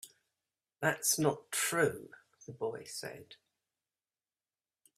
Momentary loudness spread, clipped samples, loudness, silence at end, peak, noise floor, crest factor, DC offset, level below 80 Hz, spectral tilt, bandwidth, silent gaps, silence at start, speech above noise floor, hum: 23 LU; under 0.1%; -33 LUFS; 1.65 s; -14 dBFS; under -90 dBFS; 24 dB; under 0.1%; -76 dBFS; -3 dB/octave; 15.5 kHz; none; 0.05 s; over 55 dB; none